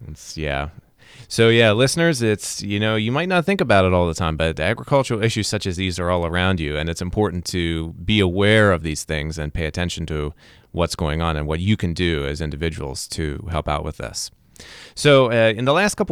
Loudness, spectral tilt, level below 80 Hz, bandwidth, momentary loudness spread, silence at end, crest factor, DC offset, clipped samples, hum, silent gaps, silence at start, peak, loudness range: -20 LUFS; -5 dB/octave; -36 dBFS; 15 kHz; 12 LU; 0 s; 18 dB; under 0.1%; under 0.1%; none; none; 0 s; -2 dBFS; 6 LU